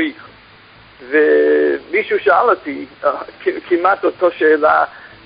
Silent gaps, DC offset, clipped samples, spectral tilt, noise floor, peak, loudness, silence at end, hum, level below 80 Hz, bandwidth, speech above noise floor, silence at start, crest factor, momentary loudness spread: none; under 0.1%; under 0.1%; -8 dB/octave; -44 dBFS; 0 dBFS; -15 LUFS; 0.2 s; none; -58 dBFS; 5.2 kHz; 29 dB; 0 s; 16 dB; 10 LU